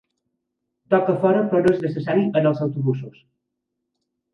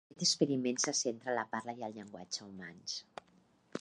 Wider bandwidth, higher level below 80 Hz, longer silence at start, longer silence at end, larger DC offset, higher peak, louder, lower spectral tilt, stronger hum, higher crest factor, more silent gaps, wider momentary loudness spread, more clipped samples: second, 6.2 kHz vs 11.5 kHz; first, -64 dBFS vs -82 dBFS; first, 0.9 s vs 0.15 s; first, 1.25 s vs 0 s; neither; first, -4 dBFS vs -16 dBFS; first, -20 LUFS vs -36 LUFS; first, -9 dB/octave vs -2.5 dB/octave; neither; about the same, 18 dB vs 22 dB; neither; second, 7 LU vs 18 LU; neither